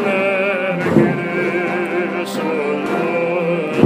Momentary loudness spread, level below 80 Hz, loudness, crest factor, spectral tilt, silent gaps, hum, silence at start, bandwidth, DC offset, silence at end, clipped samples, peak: 5 LU; -56 dBFS; -18 LUFS; 18 dB; -7 dB/octave; none; none; 0 s; 15.5 kHz; under 0.1%; 0 s; under 0.1%; 0 dBFS